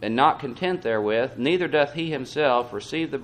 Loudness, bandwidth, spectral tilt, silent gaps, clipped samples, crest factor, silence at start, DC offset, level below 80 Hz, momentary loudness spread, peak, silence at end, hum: -24 LUFS; 11.5 kHz; -5.5 dB/octave; none; under 0.1%; 18 dB; 0 s; under 0.1%; -60 dBFS; 7 LU; -6 dBFS; 0 s; none